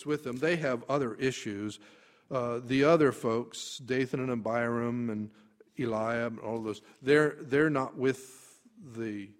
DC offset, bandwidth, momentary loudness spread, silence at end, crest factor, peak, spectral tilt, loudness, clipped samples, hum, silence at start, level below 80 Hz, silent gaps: under 0.1%; 15.5 kHz; 14 LU; 0.1 s; 20 dB; -10 dBFS; -6 dB/octave; -31 LUFS; under 0.1%; none; 0 s; -68 dBFS; none